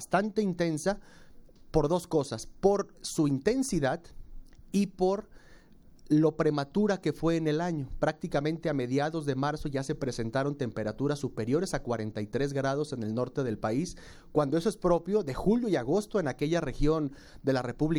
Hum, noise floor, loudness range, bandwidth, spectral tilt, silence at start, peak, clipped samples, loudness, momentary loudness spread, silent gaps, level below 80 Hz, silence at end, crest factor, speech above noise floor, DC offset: none; -54 dBFS; 3 LU; 17.5 kHz; -6.5 dB/octave; 0 s; -10 dBFS; under 0.1%; -30 LUFS; 6 LU; none; -46 dBFS; 0 s; 18 dB; 25 dB; under 0.1%